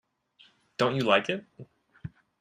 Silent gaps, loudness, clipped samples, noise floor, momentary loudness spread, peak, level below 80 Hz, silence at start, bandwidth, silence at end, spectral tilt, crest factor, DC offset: none; -27 LUFS; under 0.1%; -62 dBFS; 22 LU; -6 dBFS; -66 dBFS; 0.8 s; 13 kHz; 0.3 s; -5.5 dB/octave; 24 dB; under 0.1%